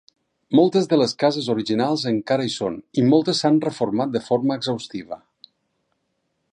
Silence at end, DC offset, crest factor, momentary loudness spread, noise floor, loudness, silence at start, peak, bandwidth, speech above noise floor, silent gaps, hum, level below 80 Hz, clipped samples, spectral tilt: 1.4 s; under 0.1%; 18 dB; 10 LU; -73 dBFS; -21 LUFS; 0.5 s; -2 dBFS; 10.5 kHz; 53 dB; none; none; -66 dBFS; under 0.1%; -6 dB/octave